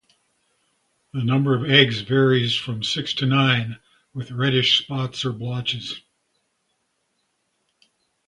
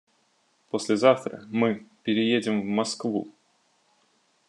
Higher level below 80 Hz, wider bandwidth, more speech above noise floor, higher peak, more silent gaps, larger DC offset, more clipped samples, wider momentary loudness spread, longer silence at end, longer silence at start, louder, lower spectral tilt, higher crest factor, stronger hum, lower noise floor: first, -60 dBFS vs -80 dBFS; about the same, 10.5 kHz vs 11 kHz; first, 51 dB vs 43 dB; first, 0 dBFS vs -6 dBFS; neither; neither; neither; first, 17 LU vs 11 LU; first, 2.3 s vs 1.2 s; first, 1.15 s vs 0.75 s; first, -20 LUFS vs -26 LUFS; about the same, -5.5 dB/octave vs -5 dB/octave; about the same, 24 dB vs 22 dB; neither; first, -72 dBFS vs -68 dBFS